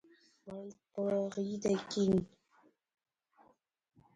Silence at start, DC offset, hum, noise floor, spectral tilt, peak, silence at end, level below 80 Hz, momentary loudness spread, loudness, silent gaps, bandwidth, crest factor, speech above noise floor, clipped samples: 0.45 s; under 0.1%; none; -70 dBFS; -6.5 dB/octave; -20 dBFS; 1.9 s; -68 dBFS; 18 LU; -35 LUFS; none; 9.4 kHz; 18 dB; 35 dB; under 0.1%